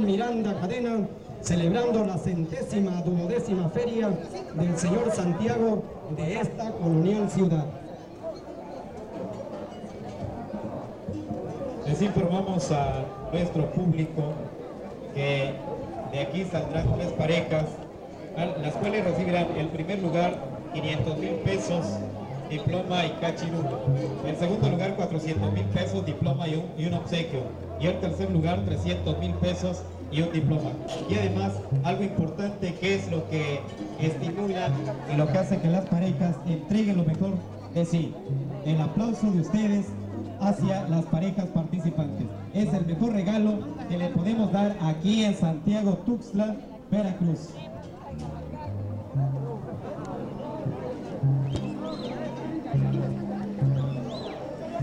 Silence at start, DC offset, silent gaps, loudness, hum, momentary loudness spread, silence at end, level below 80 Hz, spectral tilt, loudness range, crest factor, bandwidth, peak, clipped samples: 0 s; under 0.1%; none; -28 LUFS; none; 11 LU; 0 s; -50 dBFS; -7 dB/octave; 5 LU; 14 dB; 10.5 kHz; -12 dBFS; under 0.1%